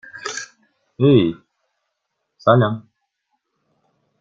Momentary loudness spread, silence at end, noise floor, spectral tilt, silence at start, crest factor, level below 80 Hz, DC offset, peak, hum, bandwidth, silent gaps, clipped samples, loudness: 19 LU; 1.4 s; -76 dBFS; -6.5 dB/octave; 0.15 s; 20 dB; -58 dBFS; under 0.1%; -2 dBFS; none; 7.8 kHz; none; under 0.1%; -18 LUFS